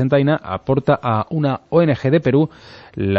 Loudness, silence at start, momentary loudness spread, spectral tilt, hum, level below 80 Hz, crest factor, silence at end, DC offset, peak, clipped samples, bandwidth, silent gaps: -18 LUFS; 0 s; 7 LU; -9.5 dB/octave; none; -48 dBFS; 14 dB; 0 s; under 0.1%; -2 dBFS; under 0.1%; 6.8 kHz; none